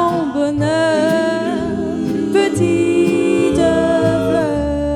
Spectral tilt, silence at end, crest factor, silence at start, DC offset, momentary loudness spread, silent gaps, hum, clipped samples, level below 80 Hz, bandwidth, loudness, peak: -6 dB/octave; 0 s; 14 dB; 0 s; under 0.1%; 5 LU; none; none; under 0.1%; -36 dBFS; 13 kHz; -16 LUFS; -2 dBFS